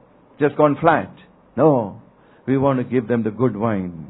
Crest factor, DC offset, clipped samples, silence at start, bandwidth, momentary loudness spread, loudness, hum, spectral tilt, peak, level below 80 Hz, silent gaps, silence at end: 20 dB; under 0.1%; under 0.1%; 0.4 s; 4.1 kHz; 13 LU; -19 LUFS; none; -12 dB/octave; 0 dBFS; -54 dBFS; none; 0 s